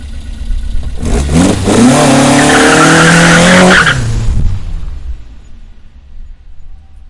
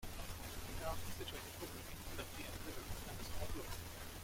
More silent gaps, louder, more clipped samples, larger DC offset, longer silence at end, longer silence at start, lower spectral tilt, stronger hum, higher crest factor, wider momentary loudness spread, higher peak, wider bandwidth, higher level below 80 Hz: neither; first, -6 LUFS vs -48 LUFS; first, 1% vs under 0.1%; neither; about the same, 0 s vs 0 s; about the same, 0 s vs 0 s; about the same, -4.5 dB/octave vs -3.5 dB/octave; neither; second, 8 dB vs 18 dB; first, 21 LU vs 3 LU; first, 0 dBFS vs -28 dBFS; second, 12 kHz vs 16.5 kHz; first, -18 dBFS vs -52 dBFS